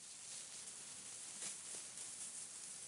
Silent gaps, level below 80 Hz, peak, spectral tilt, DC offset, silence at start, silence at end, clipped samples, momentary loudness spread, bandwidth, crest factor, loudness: none; under -90 dBFS; -30 dBFS; 0.5 dB/octave; under 0.1%; 0 s; 0 s; under 0.1%; 3 LU; 15.5 kHz; 22 dB; -48 LUFS